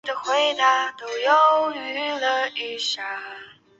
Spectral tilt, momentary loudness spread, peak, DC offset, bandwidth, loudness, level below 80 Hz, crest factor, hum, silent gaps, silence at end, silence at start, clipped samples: -0.5 dB/octave; 13 LU; -6 dBFS; under 0.1%; 8 kHz; -21 LUFS; -76 dBFS; 16 dB; none; none; 0.3 s; 0.05 s; under 0.1%